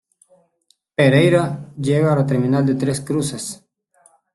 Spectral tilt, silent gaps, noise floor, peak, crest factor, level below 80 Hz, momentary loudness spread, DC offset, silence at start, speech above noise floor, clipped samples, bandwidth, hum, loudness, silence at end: -6.5 dB/octave; none; -63 dBFS; -2 dBFS; 16 dB; -54 dBFS; 14 LU; under 0.1%; 1 s; 46 dB; under 0.1%; 12.5 kHz; none; -18 LUFS; 0.8 s